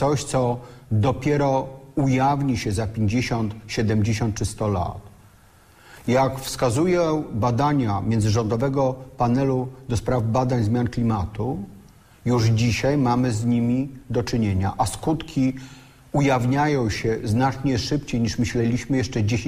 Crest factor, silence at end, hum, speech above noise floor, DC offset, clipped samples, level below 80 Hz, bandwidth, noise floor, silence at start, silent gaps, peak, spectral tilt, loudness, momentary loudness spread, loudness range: 14 dB; 0 s; none; 31 dB; under 0.1%; under 0.1%; -42 dBFS; 15.5 kHz; -52 dBFS; 0 s; none; -8 dBFS; -6.5 dB/octave; -23 LUFS; 7 LU; 2 LU